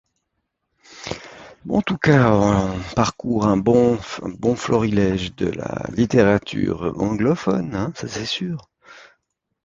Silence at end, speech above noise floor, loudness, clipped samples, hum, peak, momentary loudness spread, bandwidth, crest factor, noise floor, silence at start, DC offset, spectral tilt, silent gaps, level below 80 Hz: 0.6 s; 56 dB; -20 LUFS; under 0.1%; none; -2 dBFS; 15 LU; 7.8 kHz; 20 dB; -75 dBFS; 0.9 s; under 0.1%; -6.5 dB/octave; none; -44 dBFS